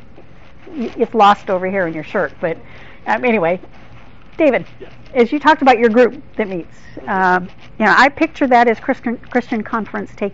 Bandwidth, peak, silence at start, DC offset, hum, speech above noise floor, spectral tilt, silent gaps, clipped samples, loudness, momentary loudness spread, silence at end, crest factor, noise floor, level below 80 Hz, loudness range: 7.8 kHz; -2 dBFS; 0.65 s; 2%; none; 27 dB; -3.5 dB/octave; none; under 0.1%; -16 LUFS; 15 LU; 0.05 s; 14 dB; -42 dBFS; -48 dBFS; 5 LU